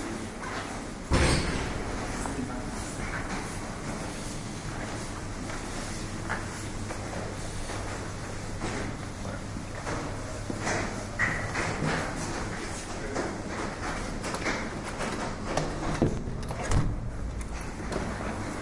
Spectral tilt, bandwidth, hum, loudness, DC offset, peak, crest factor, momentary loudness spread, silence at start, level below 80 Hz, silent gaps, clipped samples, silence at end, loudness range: -4.5 dB/octave; 11.5 kHz; none; -33 LUFS; under 0.1%; -10 dBFS; 22 dB; 8 LU; 0 s; -40 dBFS; none; under 0.1%; 0 s; 4 LU